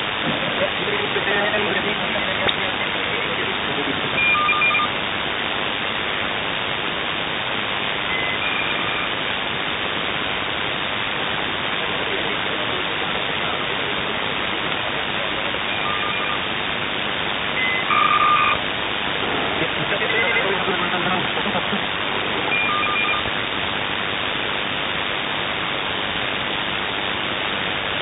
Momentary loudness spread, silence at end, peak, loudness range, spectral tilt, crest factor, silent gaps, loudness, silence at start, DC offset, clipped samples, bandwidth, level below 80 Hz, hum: 5 LU; 0 s; -4 dBFS; 3 LU; -0.5 dB/octave; 18 dB; none; -20 LUFS; 0 s; under 0.1%; under 0.1%; 4.1 kHz; -48 dBFS; none